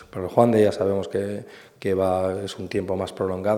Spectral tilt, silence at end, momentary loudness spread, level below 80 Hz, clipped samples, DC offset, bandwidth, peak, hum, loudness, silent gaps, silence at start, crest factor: -7 dB/octave; 0 s; 12 LU; -60 dBFS; under 0.1%; under 0.1%; 16 kHz; -2 dBFS; none; -23 LUFS; none; 0 s; 20 dB